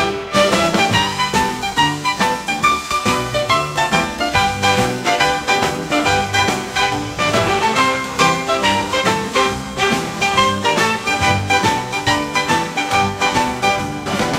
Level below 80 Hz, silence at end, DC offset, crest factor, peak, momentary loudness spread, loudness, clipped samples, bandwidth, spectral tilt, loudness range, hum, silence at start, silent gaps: -42 dBFS; 0 s; under 0.1%; 16 dB; 0 dBFS; 3 LU; -16 LUFS; under 0.1%; 16 kHz; -3.5 dB/octave; 1 LU; none; 0 s; none